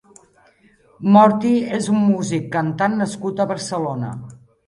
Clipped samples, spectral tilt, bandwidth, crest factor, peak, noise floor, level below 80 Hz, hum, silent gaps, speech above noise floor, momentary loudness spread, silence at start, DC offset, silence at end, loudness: under 0.1%; -6.5 dB/octave; 11.5 kHz; 18 dB; 0 dBFS; -54 dBFS; -58 dBFS; none; none; 37 dB; 13 LU; 1 s; under 0.1%; 0.3 s; -18 LUFS